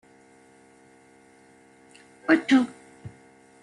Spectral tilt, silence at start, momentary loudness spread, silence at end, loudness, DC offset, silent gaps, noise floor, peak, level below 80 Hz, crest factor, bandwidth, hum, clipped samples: -5 dB/octave; 2.3 s; 27 LU; 0.55 s; -23 LUFS; under 0.1%; none; -55 dBFS; -6 dBFS; -70 dBFS; 22 dB; 11 kHz; none; under 0.1%